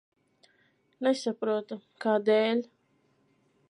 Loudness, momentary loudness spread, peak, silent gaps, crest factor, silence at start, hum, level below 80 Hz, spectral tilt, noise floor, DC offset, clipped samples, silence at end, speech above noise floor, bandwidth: -28 LUFS; 10 LU; -14 dBFS; none; 18 dB; 1 s; none; -88 dBFS; -5 dB/octave; -70 dBFS; under 0.1%; under 0.1%; 1.05 s; 42 dB; 11 kHz